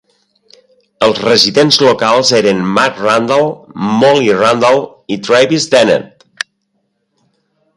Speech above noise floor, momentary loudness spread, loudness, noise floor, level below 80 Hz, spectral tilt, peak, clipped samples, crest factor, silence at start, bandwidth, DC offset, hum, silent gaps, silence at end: 55 dB; 12 LU; -10 LUFS; -65 dBFS; -54 dBFS; -4 dB/octave; 0 dBFS; under 0.1%; 12 dB; 1 s; 16 kHz; under 0.1%; none; none; 1.7 s